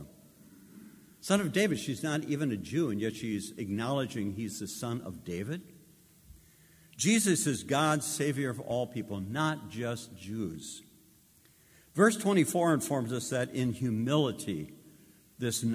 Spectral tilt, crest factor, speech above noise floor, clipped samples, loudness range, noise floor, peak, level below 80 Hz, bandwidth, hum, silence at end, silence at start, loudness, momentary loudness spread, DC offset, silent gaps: -4.5 dB/octave; 22 dB; 31 dB; under 0.1%; 7 LU; -62 dBFS; -10 dBFS; -62 dBFS; 16 kHz; none; 0 s; 0 s; -31 LUFS; 13 LU; under 0.1%; none